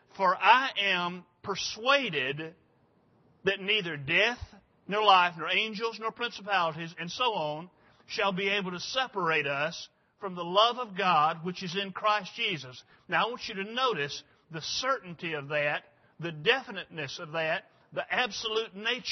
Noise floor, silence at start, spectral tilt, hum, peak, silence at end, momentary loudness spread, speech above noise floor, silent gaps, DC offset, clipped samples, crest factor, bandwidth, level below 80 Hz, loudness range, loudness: -66 dBFS; 0.15 s; -3.5 dB/octave; none; -6 dBFS; 0 s; 14 LU; 37 dB; none; under 0.1%; under 0.1%; 24 dB; 6.4 kHz; -66 dBFS; 4 LU; -29 LUFS